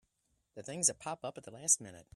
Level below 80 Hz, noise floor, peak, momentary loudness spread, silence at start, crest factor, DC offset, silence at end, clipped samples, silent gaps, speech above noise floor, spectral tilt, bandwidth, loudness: -76 dBFS; -80 dBFS; -14 dBFS; 15 LU; 0.55 s; 24 dB; under 0.1%; 0.15 s; under 0.1%; none; 43 dB; -1.5 dB/octave; 14.5 kHz; -33 LUFS